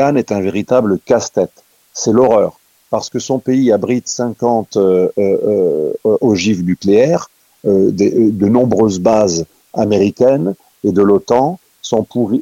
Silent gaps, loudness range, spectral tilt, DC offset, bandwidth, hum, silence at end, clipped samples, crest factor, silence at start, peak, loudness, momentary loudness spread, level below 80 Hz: none; 2 LU; -6 dB/octave; under 0.1%; 16 kHz; none; 0 s; under 0.1%; 12 dB; 0 s; 0 dBFS; -14 LUFS; 8 LU; -52 dBFS